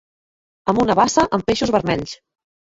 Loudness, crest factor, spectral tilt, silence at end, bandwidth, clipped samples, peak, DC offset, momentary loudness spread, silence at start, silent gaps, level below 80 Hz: -18 LUFS; 18 dB; -4.5 dB/octave; 0.45 s; 8 kHz; under 0.1%; -2 dBFS; under 0.1%; 13 LU; 0.65 s; none; -46 dBFS